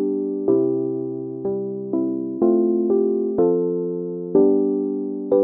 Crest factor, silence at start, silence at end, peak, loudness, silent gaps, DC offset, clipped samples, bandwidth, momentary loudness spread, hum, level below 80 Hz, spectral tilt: 16 dB; 0 s; 0 s; -4 dBFS; -21 LUFS; none; under 0.1%; under 0.1%; 1.7 kHz; 9 LU; none; -64 dBFS; -13.5 dB/octave